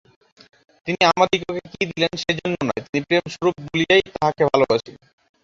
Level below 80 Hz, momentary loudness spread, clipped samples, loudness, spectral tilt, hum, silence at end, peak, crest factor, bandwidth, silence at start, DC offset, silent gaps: -54 dBFS; 9 LU; under 0.1%; -20 LUFS; -5 dB/octave; none; 0.5 s; -2 dBFS; 20 dB; 7.6 kHz; 0.85 s; under 0.1%; 2.89-2.93 s